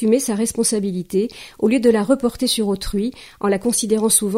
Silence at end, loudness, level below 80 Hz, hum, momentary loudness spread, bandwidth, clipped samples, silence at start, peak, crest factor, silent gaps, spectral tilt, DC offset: 0 s; -19 LUFS; -42 dBFS; none; 8 LU; 16 kHz; under 0.1%; 0 s; -2 dBFS; 16 dB; none; -4 dB/octave; under 0.1%